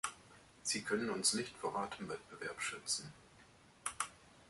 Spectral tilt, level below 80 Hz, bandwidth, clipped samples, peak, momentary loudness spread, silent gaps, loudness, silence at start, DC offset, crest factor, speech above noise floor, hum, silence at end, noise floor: -2 dB/octave; -74 dBFS; 12 kHz; under 0.1%; -18 dBFS; 12 LU; none; -40 LUFS; 0.05 s; under 0.1%; 24 dB; 23 dB; none; 0 s; -64 dBFS